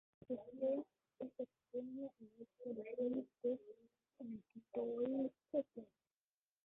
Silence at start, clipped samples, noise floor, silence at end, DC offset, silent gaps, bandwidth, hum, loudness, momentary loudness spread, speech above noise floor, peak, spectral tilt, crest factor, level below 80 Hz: 0.3 s; under 0.1%; under -90 dBFS; 0.8 s; under 0.1%; none; 3.9 kHz; none; -46 LUFS; 17 LU; over 46 dB; -28 dBFS; -8 dB/octave; 18 dB; -86 dBFS